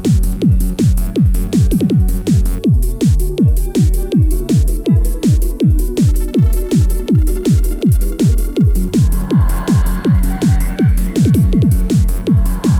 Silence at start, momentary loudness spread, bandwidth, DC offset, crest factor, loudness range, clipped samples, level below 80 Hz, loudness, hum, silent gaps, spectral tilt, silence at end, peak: 0 s; 2 LU; 16.5 kHz; under 0.1%; 10 dB; 1 LU; under 0.1%; -16 dBFS; -14 LUFS; none; none; -7.5 dB/octave; 0 s; -2 dBFS